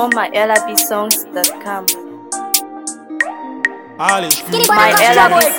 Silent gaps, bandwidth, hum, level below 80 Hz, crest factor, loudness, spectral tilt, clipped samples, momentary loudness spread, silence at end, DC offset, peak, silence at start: none; 19.5 kHz; none; -56 dBFS; 14 dB; -13 LUFS; -1.5 dB/octave; under 0.1%; 15 LU; 0 s; 0.1%; 0 dBFS; 0 s